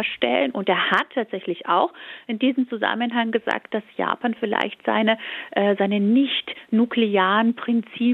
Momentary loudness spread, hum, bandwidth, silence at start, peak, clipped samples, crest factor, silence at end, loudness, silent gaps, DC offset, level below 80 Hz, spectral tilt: 8 LU; none; 4.9 kHz; 0 s; -4 dBFS; under 0.1%; 18 dB; 0 s; -22 LUFS; none; under 0.1%; -74 dBFS; -7 dB/octave